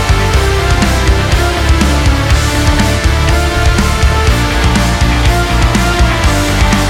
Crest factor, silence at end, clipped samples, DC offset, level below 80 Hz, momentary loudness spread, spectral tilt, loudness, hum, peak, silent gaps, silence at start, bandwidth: 10 dB; 0 s; under 0.1%; under 0.1%; -12 dBFS; 1 LU; -5 dB/octave; -11 LUFS; none; 0 dBFS; none; 0 s; 16.5 kHz